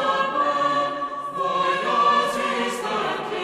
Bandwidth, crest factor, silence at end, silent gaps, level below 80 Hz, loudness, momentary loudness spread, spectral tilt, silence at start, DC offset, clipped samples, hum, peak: 14 kHz; 14 dB; 0 s; none; -62 dBFS; -22 LUFS; 7 LU; -3.5 dB/octave; 0 s; under 0.1%; under 0.1%; none; -8 dBFS